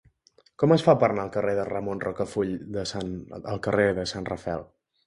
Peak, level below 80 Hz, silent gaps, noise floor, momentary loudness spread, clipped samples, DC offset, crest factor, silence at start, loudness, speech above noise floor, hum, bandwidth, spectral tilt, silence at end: -4 dBFS; -52 dBFS; none; -62 dBFS; 13 LU; under 0.1%; under 0.1%; 22 dB; 0.6 s; -26 LUFS; 37 dB; none; 11.5 kHz; -6.5 dB/octave; 0.4 s